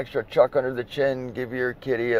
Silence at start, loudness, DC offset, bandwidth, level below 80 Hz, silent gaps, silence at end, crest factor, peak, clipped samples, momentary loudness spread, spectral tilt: 0 s; -25 LUFS; under 0.1%; 14.5 kHz; -54 dBFS; none; 0 s; 20 dB; -4 dBFS; under 0.1%; 8 LU; -7 dB/octave